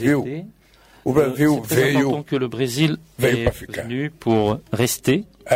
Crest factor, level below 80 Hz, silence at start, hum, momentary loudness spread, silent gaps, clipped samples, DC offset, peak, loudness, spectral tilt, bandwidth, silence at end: 16 dB; -44 dBFS; 0 s; none; 9 LU; none; under 0.1%; under 0.1%; -6 dBFS; -21 LUFS; -5.5 dB/octave; 16 kHz; 0 s